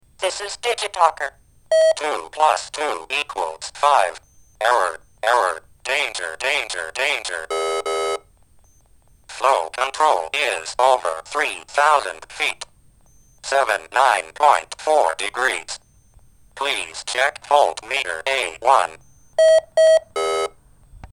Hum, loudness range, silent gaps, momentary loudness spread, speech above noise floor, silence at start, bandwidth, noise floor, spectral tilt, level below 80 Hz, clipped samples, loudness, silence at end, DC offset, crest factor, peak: none; 4 LU; none; 9 LU; 34 dB; 0.2 s; 16 kHz; -53 dBFS; -0.5 dB/octave; -56 dBFS; under 0.1%; -20 LUFS; 0.05 s; under 0.1%; 20 dB; 0 dBFS